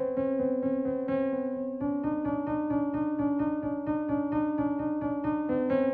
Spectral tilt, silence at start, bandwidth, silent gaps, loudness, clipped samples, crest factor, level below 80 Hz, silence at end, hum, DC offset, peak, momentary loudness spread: -11 dB/octave; 0 s; 3.7 kHz; none; -30 LUFS; under 0.1%; 14 dB; -58 dBFS; 0 s; none; under 0.1%; -16 dBFS; 3 LU